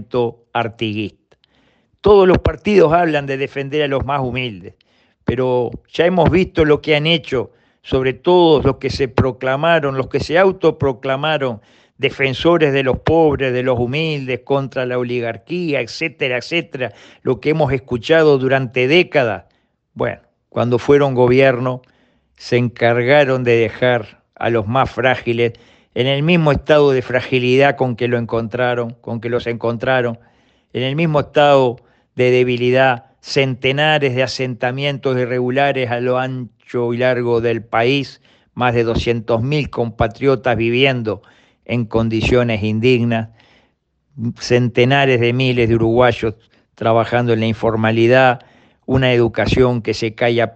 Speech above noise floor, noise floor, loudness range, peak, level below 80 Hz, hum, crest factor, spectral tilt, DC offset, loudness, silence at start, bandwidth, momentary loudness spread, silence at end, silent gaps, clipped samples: 47 dB; -63 dBFS; 3 LU; 0 dBFS; -40 dBFS; none; 16 dB; -6.5 dB/octave; under 0.1%; -16 LUFS; 0 s; 8.4 kHz; 11 LU; 0.05 s; none; under 0.1%